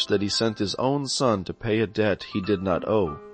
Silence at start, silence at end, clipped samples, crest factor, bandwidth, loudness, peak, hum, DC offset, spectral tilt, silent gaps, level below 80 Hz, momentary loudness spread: 0 s; 0 s; under 0.1%; 16 dB; 8.8 kHz; -25 LUFS; -10 dBFS; none; under 0.1%; -5 dB/octave; none; -52 dBFS; 4 LU